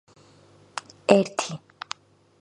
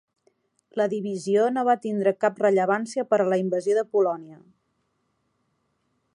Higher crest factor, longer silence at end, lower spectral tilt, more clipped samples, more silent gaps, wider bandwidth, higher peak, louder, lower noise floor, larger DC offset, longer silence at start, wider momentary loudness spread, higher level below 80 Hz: first, 28 dB vs 18 dB; second, 0.85 s vs 1.8 s; second, -4.5 dB/octave vs -6 dB/octave; neither; neither; about the same, 11.5 kHz vs 11 kHz; first, 0 dBFS vs -8 dBFS; about the same, -23 LUFS vs -24 LUFS; second, -55 dBFS vs -73 dBFS; neither; about the same, 0.75 s vs 0.75 s; first, 18 LU vs 5 LU; first, -70 dBFS vs -80 dBFS